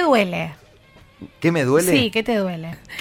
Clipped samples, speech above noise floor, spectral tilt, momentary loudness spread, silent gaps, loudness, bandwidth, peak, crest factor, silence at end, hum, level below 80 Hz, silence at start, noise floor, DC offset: under 0.1%; 30 dB; -5 dB/octave; 15 LU; none; -19 LUFS; 16.5 kHz; -4 dBFS; 18 dB; 0 s; none; -52 dBFS; 0 s; -49 dBFS; under 0.1%